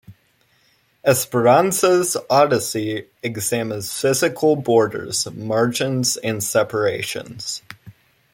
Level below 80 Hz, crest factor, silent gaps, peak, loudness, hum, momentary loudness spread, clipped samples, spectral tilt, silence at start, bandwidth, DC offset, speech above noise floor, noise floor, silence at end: -62 dBFS; 18 dB; none; -2 dBFS; -19 LUFS; none; 12 LU; under 0.1%; -4 dB/octave; 0.1 s; 16.5 kHz; under 0.1%; 42 dB; -61 dBFS; 0.45 s